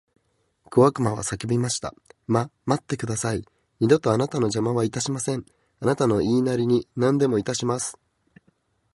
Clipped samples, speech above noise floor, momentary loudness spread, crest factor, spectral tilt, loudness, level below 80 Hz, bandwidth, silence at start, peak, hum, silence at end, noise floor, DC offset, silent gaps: under 0.1%; 46 dB; 9 LU; 20 dB; -5.5 dB/octave; -24 LUFS; -54 dBFS; 11.5 kHz; 0.7 s; -4 dBFS; none; 1.05 s; -69 dBFS; under 0.1%; none